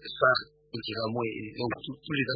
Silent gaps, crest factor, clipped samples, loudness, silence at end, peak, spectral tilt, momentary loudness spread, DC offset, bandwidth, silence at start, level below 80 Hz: none; 22 dB; under 0.1%; -30 LUFS; 0 s; -10 dBFS; -9 dB/octave; 13 LU; under 0.1%; 5 kHz; 0 s; -64 dBFS